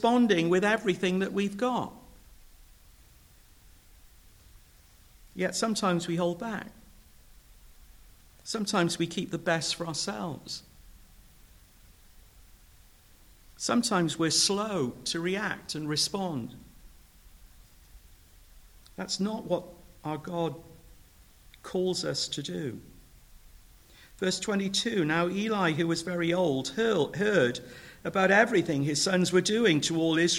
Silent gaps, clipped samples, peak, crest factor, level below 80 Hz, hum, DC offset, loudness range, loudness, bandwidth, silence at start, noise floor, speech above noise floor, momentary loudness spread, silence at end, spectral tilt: none; under 0.1%; -10 dBFS; 22 dB; -58 dBFS; none; under 0.1%; 11 LU; -28 LUFS; 19.5 kHz; 0 s; -57 dBFS; 29 dB; 15 LU; 0 s; -4 dB/octave